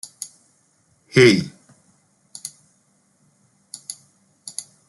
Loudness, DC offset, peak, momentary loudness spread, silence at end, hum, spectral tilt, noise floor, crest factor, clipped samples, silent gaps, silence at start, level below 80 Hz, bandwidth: -17 LUFS; under 0.1%; -2 dBFS; 26 LU; 0.25 s; none; -4.5 dB/octave; -62 dBFS; 24 dB; under 0.1%; none; 0.2 s; -64 dBFS; 12.5 kHz